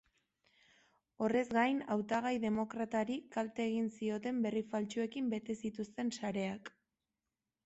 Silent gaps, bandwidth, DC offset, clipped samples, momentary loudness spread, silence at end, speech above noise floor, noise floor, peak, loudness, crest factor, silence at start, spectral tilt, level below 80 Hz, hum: none; 8.2 kHz; under 0.1%; under 0.1%; 7 LU; 0.95 s; over 54 dB; under -90 dBFS; -20 dBFS; -37 LUFS; 18 dB; 1.2 s; -5.5 dB/octave; -74 dBFS; none